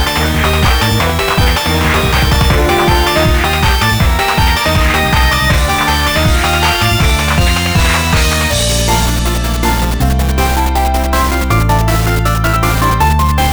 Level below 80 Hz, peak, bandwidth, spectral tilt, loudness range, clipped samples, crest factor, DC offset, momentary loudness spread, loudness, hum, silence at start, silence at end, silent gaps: -16 dBFS; 0 dBFS; over 20 kHz; -4 dB/octave; 2 LU; under 0.1%; 10 dB; under 0.1%; 3 LU; -11 LUFS; none; 0 s; 0 s; none